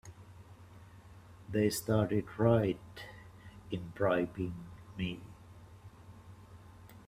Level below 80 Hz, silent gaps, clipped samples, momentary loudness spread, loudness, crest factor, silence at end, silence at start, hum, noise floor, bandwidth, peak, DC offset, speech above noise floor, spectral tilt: -60 dBFS; none; under 0.1%; 25 LU; -34 LUFS; 22 dB; 0.05 s; 0.05 s; none; -55 dBFS; 15.5 kHz; -14 dBFS; under 0.1%; 22 dB; -6.5 dB/octave